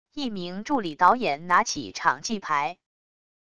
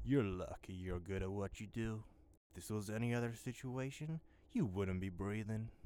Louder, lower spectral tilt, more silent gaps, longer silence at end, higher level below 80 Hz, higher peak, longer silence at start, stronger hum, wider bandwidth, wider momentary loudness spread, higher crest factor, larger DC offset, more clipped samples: first, -25 LUFS vs -43 LUFS; second, -3.5 dB/octave vs -7 dB/octave; second, none vs 2.37-2.50 s; first, 0.65 s vs 0 s; about the same, -60 dBFS vs -58 dBFS; first, -6 dBFS vs -24 dBFS; about the same, 0.05 s vs 0 s; neither; second, 11 kHz vs 17.5 kHz; about the same, 11 LU vs 9 LU; about the same, 22 dB vs 18 dB; first, 0.4% vs under 0.1%; neither